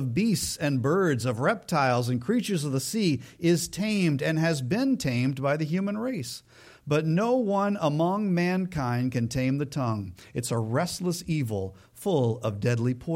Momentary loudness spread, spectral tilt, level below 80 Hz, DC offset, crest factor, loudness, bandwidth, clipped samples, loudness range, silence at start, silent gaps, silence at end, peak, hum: 6 LU; -6 dB/octave; -56 dBFS; under 0.1%; 14 dB; -27 LUFS; 16.5 kHz; under 0.1%; 3 LU; 0 s; none; 0 s; -12 dBFS; none